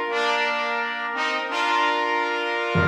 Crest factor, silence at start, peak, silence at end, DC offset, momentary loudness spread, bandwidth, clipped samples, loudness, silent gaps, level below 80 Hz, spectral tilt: 14 dB; 0 s; -10 dBFS; 0 s; under 0.1%; 4 LU; 14.5 kHz; under 0.1%; -23 LUFS; none; -60 dBFS; -4.5 dB/octave